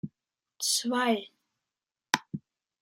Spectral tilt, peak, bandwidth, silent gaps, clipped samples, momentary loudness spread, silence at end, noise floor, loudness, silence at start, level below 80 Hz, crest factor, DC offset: -2 dB/octave; -4 dBFS; 16 kHz; none; under 0.1%; 17 LU; 0.45 s; under -90 dBFS; -29 LUFS; 0.05 s; -78 dBFS; 28 dB; under 0.1%